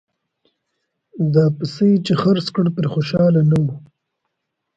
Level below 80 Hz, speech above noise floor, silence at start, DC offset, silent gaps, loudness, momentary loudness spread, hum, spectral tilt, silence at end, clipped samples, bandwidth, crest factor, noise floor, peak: -54 dBFS; 60 dB; 1.15 s; under 0.1%; none; -17 LUFS; 7 LU; none; -8.5 dB/octave; 0.95 s; under 0.1%; 7.8 kHz; 16 dB; -77 dBFS; -2 dBFS